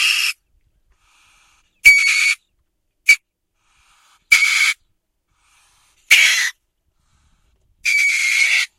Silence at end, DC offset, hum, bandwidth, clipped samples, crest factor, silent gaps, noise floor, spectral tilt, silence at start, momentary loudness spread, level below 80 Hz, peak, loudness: 0.1 s; under 0.1%; none; 16 kHz; under 0.1%; 20 dB; none; -68 dBFS; 4 dB/octave; 0 s; 13 LU; -58 dBFS; 0 dBFS; -13 LUFS